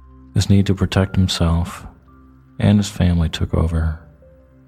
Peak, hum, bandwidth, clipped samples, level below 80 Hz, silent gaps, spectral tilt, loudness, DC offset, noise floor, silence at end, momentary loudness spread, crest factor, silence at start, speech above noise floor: 0 dBFS; none; 14.5 kHz; under 0.1%; -30 dBFS; none; -6.5 dB/octave; -18 LUFS; under 0.1%; -47 dBFS; 0.7 s; 9 LU; 18 dB; 0.35 s; 31 dB